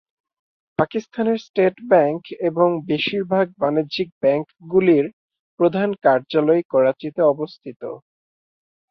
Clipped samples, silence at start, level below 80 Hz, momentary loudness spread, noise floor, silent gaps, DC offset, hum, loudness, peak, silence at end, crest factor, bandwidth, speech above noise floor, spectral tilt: under 0.1%; 0.8 s; -64 dBFS; 11 LU; under -90 dBFS; 1.49-1.54 s, 4.12-4.21 s, 5.13-5.29 s, 5.39-5.57 s, 6.65-6.70 s, 7.76-7.80 s; under 0.1%; none; -20 LUFS; -2 dBFS; 0.95 s; 18 dB; 6.2 kHz; over 71 dB; -7.5 dB/octave